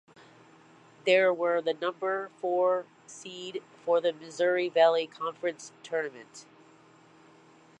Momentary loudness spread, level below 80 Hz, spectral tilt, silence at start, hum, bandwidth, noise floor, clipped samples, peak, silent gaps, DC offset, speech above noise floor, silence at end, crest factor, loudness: 20 LU; -88 dBFS; -3.5 dB/octave; 1.05 s; none; 9.4 kHz; -57 dBFS; under 0.1%; -10 dBFS; none; under 0.1%; 29 dB; 1.4 s; 20 dB; -28 LUFS